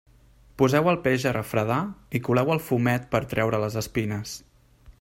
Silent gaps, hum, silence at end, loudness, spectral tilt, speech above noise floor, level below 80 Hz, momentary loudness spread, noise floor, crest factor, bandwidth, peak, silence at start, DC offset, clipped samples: none; none; 0.1 s; -25 LUFS; -6 dB/octave; 30 dB; -52 dBFS; 9 LU; -55 dBFS; 18 dB; 16 kHz; -6 dBFS; 0.6 s; under 0.1%; under 0.1%